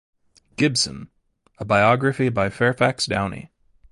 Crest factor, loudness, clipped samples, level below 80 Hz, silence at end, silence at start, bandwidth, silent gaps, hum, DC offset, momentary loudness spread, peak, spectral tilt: 20 dB; -20 LUFS; under 0.1%; -50 dBFS; 0.45 s; 0.6 s; 11.5 kHz; none; none; under 0.1%; 19 LU; -2 dBFS; -4.5 dB/octave